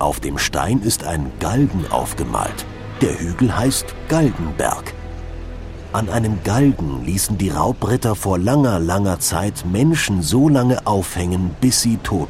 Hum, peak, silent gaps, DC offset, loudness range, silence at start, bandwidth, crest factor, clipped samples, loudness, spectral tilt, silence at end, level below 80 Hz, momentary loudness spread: none; -2 dBFS; none; under 0.1%; 4 LU; 0 s; 16 kHz; 16 dB; under 0.1%; -18 LUFS; -5 dB/octave; 0 s; -34 dBFS; 9 LU